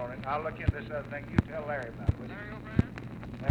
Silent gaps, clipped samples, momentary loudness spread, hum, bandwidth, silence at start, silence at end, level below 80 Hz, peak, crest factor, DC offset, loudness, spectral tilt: none; under 0.1%; 9 LU; none; 8.8 kHz; 0 s; 0 s; -42 dBFS; -10 dBFS; 24 dB; under 0.1%; -34 LUFS; -8.5 dB/octave